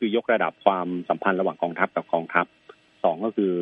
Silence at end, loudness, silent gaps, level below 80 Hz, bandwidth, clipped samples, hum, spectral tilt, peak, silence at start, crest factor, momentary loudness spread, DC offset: 0 s; -25 LUFS; none; -74 dBFS; 4.5 kHz; under 0.1%; none; -8.5 dB/octave; -2 dBFS; 0 s; 24 dB; 4 LU; under 0.1%